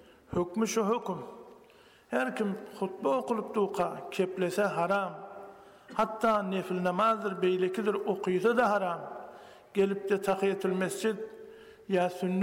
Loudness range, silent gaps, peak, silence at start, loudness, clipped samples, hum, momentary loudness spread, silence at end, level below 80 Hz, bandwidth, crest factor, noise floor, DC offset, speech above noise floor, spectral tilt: 4 LU; none; -16 dBFS; 0.3 s; -30 LUFS; under 0.1%; none; 16 LU; 0 s; -68 dBFS; 16.5 kHz; 14 dB; -58 dBFS; under 0.1%; 29 dB; -5.5 dB/octave